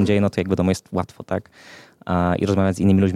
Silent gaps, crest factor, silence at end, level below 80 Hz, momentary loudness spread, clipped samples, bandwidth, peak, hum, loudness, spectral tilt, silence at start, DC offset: none; 14 dB; 0 s; -48 dBFS; 11 LU; under 0.1%; 11.5 kHz; -6 dBFS; none; -21 LUFS; -7.5 dB/octave; 0 s; under 0.1%